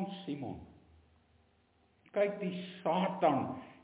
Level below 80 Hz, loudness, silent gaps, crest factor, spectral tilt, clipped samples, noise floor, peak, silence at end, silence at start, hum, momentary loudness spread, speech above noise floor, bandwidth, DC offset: -68 dBFS; -35 LUFS; none; 22 dB; -5.5 dB/octave; under 0.1%; -70 dBFS; -16 dBFS; 0.1 s; 0 s; none; 12 LU; 36 dB; 4 kHz; under 0.1%